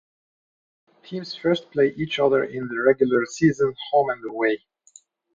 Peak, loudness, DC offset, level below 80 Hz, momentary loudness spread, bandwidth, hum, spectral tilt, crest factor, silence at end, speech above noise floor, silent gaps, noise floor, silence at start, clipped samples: -4 dBFS; -22 LUFS; under 0.1%; -62 dBFS; 9 LU; 7.6 kHz; none; -5.5 dB/octave; 20 dB; 0.75 s; 32 dB; none; -54 dBFS; 1.1 s; under 0.1%